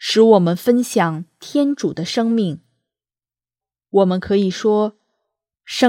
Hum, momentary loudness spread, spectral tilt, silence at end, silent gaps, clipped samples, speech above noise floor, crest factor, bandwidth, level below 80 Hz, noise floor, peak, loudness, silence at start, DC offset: none; 12 LU; -5.5 dB/octave; 0 s; none; under 0.1%; over 74 dB; 18 dB; 16.5 kHz; -58 dBFS; under -90 dBFS; 0 dBFS; -17 LUFS; 0 s; under 0.1%